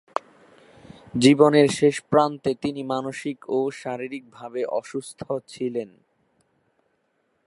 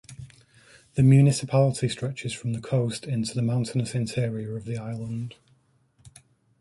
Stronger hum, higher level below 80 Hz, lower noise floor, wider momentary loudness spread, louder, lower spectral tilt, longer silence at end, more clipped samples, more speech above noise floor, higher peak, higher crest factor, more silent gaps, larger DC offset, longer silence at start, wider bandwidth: neither; second, -64 dBFS vs -56 dBFS; first, -70 dBFS vs -64 dBFS; about the same, 17 LU vs 15 LU; about the same, -23 LUFS vs -25 LUFS; about the same, -5.5 dB/octave vs -6.5 dB/octave; first, 1.6 s vs 1.3 s; neither; first, 48 dB vs 40 dB; first, -2 dBFS vs -8 dBFS; about the same, 22 dB vs 18 dB; neither; neither; about the same, 0.15 s vs 0.1 s; about the same, 11.5 kHz vs 11.5 kHz